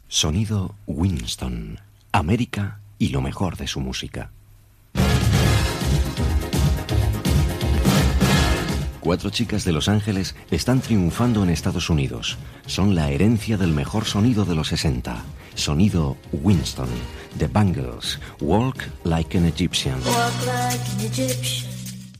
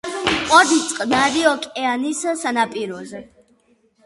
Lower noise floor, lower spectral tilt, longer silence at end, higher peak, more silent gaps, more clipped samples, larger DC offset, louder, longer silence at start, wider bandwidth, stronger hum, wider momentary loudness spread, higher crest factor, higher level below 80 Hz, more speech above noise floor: second, -51 dBFS vs -59 dBFS; first, -5.5 dB/octave vs -2 dB/octave; second, 0 s vs 0.8 s; second, -4 dBFS vs 0 dBFS; neither; neither; neither; second, -22 LUFS vs -18 LUFS; about the same, 0.1 s vs 0.05 s; first, 15.5 kHz vs 11.5 kHz; neither; second, 9 LU vs 16 LU; about the same, 16 dB vs 20 dB; first, -30 dBFS vs -52 dBFS; second, 29 dB vs 41 dB